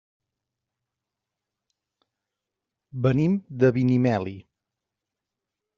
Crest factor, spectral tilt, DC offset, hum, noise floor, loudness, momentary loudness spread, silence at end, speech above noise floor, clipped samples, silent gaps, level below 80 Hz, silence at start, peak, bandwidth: 22 dB; -8.5 dB/octave; under 0.1%; none; -86 dBFS; -23 LUFS; 11 LU; 1.35 s; 64 dB; under 0.1%; none; -62 dBFS; 2.95 s; -6 dBFS; 7 kHz